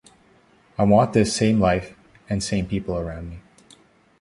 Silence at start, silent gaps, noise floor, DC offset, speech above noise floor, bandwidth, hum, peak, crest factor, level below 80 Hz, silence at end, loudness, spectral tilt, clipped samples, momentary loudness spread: 0.8 s; none; -56 dBFS; under 0.1%; 36 dB; 11.5 kHz; none; -4 dBFS; 18 dB; -42 dBFS; 0.8 s; -21 LUFS; -6 dB/octave; under 0.1%; 19 LU